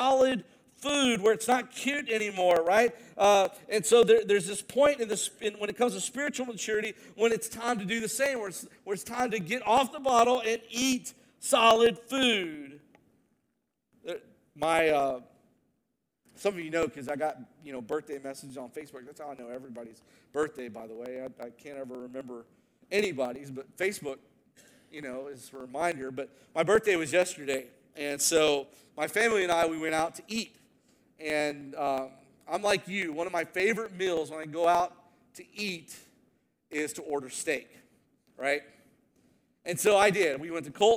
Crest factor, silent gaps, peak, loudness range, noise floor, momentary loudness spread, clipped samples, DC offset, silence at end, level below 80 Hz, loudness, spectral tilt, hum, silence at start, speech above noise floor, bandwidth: 22 dB; none; -8 dBFS; 11 LU; -80 dBFS; 19 LU; under 0.1%; under 0.1%; 0 s; -68 dBFS; -28 LUFS; -3 dB/octave; none; 0 s; 51 dB; 18 kHz